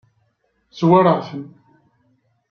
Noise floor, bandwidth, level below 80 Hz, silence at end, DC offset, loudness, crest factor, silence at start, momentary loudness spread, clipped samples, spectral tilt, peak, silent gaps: -66 dBFS; 6.6 kHz; -64 dBFS; 1.05 s; under 0.1%; -16 LUFS; 18 dB; 0.75 s; 21 LU; under 0.1%; -8.5 dB/octave; -2 dBFS; none